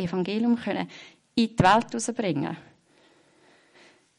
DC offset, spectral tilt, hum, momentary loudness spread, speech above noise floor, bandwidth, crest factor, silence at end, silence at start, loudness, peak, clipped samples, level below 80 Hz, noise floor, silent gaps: under 0.1%; -5 dB/octave; none; 15 LU; 35 dB; 11 kHz; 18 dB; 1.6 s; 0 s; -25 LUFS; -8 dBFS; under 0.1%; -56 dBFS; -60 dBFS; none